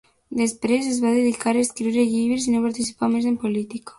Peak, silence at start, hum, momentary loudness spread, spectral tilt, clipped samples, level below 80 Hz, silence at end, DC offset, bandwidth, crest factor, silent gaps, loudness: -8 dBFS; 0.3 s; none; 4 LU; -4.5 dB/octave; under 0.1%; -58 dBFS; 0.05 s; under 0.1%; 11.5 kHz; 14 dB; none; -22 LUFS